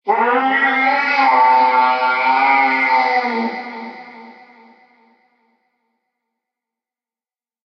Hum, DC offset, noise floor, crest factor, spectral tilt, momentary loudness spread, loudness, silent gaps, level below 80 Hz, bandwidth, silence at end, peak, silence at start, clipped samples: none; under 0.1%; under -90 dBFS; 14 dB; -4 dB/octave; 16 LU; -14 LUFS; none; -82 dBFS; 6.4 kHz; 3.35 s; -2 dBFS; 0.05 s; under 0.1%